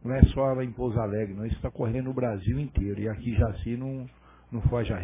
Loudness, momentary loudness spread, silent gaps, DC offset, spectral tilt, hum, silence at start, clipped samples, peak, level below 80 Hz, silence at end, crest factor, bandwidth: -29 LUFS; 10 LU; none; under 0.1%; -12.5 dB/octave; none; 0.05 s; under 0.1%; -2 dBFS; -34 dBFS; 0 s; 24 dB; 3.8 kHz